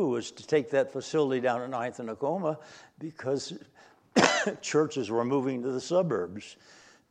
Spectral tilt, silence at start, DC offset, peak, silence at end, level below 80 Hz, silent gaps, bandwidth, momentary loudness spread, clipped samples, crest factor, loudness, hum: -4.5 dB/octave; 0 s; under 0.1%; -4 dBFS; 0.55 s; -74 dBFS; none; 11 kHz; 16 LU; under 0.1%; 26 dB; -29 LUFS; none